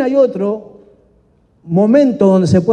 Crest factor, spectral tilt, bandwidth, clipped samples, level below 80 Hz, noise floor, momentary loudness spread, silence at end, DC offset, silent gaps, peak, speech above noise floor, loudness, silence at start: 12 dB; -8.5 dB/octave; 9.2 kHz; under 0.1%; -52 dBFS; -53 dBFS; 10 LU; 0 s; under 0.1%; none; 0 dBFS; 42 dB; -13 LUFS; 0 s